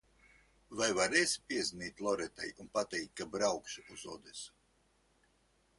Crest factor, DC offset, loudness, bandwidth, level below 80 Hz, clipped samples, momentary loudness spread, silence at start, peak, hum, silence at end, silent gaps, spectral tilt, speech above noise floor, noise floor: 24 dB; under 0.1%; -35 LUFS; 11.5 kHz; -70 dBFS; under 0.1%; 18 LU; 0.7 s; -14 dBFS; none; 1.3 s; none; -2 dB/octave; 36 dB; -73 dBFS